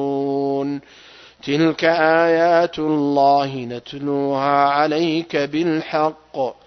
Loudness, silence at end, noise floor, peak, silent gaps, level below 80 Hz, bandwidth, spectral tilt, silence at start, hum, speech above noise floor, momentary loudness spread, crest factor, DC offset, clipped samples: -18 LUFS; 0.15 s; -45 dBFS; -2 dBFS; none; -62 dBFS; 6.4 kHz; -6.5 dB/octave; 0 s; none; 27 dB; 11 LU; 16 dB; under 0.1%; under 0.1%